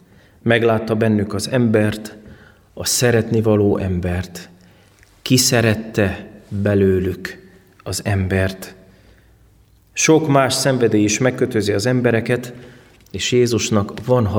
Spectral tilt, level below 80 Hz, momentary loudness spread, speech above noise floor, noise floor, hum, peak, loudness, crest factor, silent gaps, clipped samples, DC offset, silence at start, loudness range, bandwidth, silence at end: -5 dB/octave; -46 dBFS; 15 LU; 35 dB; -52 dBFS; none; -2 dBFS; -17 LUFS; 16 dB; none; under 0.1%; under 0.1%; 0.45 s; 5 LU; 20 kHz; 0 s